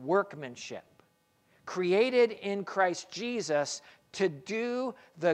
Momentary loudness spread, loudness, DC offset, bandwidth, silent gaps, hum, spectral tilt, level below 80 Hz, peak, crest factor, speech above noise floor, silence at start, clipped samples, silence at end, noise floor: 16 LU; -31 LUFS; under 0.1%; 10.5 kHz; none; none; -4.5 dB/octave; -80 dBFS; -14 dBFS; 18 dB; 39 dB; 0 s; under 0.1%; 0 s; -70 dBFS